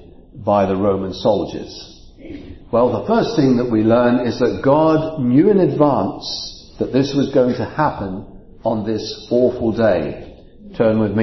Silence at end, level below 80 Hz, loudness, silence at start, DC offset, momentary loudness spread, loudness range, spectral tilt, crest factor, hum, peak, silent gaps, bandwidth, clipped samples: 0 s; -42 dBFS; -17 LUFS; 0 s; under 0.1%; 16 LU; 5 LU; -7.5 dB/octave; 16 dB; none; -2 dBFS; none; 6.2 kHz; under 0.1%